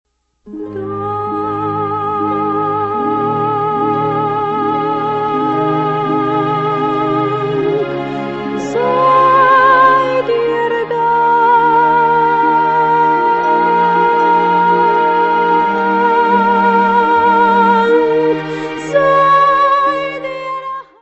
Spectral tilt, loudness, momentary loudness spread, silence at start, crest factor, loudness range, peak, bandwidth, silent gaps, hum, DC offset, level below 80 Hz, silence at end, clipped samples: -6.5 dB/octave; -13 LUFS; 10 LU; 0.45 s; 12 dB; 5 LU; 0 dBFS; 8.2 kHz; none; none; under 0.1%; -50 dBFS; 0.2 s; under 0.1%